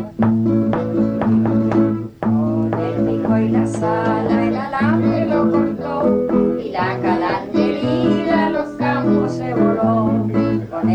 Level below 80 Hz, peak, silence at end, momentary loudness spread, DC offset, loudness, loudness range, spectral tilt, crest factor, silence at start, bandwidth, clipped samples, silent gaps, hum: -46 dBFS; -4 dBFS; 0 s; 4 LU; under 0.1%; -18 LUFS; 1 LU; -8.5 dB/octave; 12 dB; 0 s; 8.8 kHz; under 0.1%; none; none